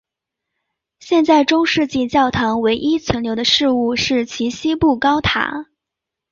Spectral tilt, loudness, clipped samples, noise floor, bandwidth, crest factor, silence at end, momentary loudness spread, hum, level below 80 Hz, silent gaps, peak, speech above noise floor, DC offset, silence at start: -4.5 dB/octave; -16 LUFS; under 0.1%; -83 dBFS; 7.4 kHz; 16 dB; 0.7 s; 7 LU; none; -42 dBFS; none; -2 dBFS; 67 dB; under 0.1%; 1.05 s